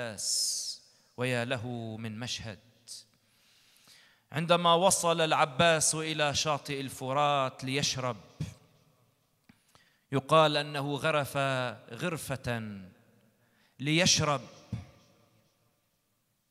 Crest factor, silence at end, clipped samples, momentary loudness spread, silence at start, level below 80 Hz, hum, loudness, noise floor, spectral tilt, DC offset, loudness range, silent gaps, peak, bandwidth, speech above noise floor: 22 dB; 1.65 s; under 0.1%; 19 LU; 0 s; -64 dBFS; none; -29 LUFS; -76 dBFS; -3 dB/octave; under 0.1%; 8 LU; none; -10 dBFS; 15.5 kHz; 46 dB